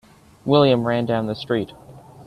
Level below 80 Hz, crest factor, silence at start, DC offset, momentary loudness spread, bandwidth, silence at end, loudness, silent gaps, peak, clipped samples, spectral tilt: -56 dBFS; 18 dB; 0.45 s; under 0.1%; 13 LU; 13 kHz; 0.05 s; -20 LUFS; none; -2 dBFS; under 0.1%; -8 dB/octave